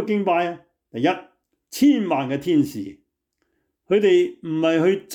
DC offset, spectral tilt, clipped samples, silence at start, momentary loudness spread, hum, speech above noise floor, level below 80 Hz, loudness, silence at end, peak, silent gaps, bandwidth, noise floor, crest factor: under 0.1%; -6 dB/octave; under 0.1%; 0 s; 17 LU; none; 54 dB; -68 dBFS; -21 LUFS; 0 s; -8 dBFS; none; 19 kHz; -74 dBFS; 14 dB